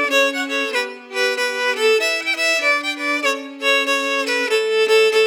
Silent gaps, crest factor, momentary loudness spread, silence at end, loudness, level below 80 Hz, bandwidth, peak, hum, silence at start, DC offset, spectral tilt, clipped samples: none; 14 dB; 6 LU; 0 s; -18 LUFS; -88 dBFS; 19 kHz; -6 dBFS; none; 0 s; under 0.1%; 1 dB/octave; under 0.1%